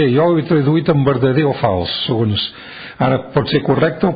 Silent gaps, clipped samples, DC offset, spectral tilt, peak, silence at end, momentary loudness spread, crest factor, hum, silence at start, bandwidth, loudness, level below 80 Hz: none; under 0.1%; under 0.1%; -12.5 dB/octave; -2 dBFS; 0 s; 6 LU; 12 dB; none; 0 s; 5 kHz; -16 LUFS; -42 dBFS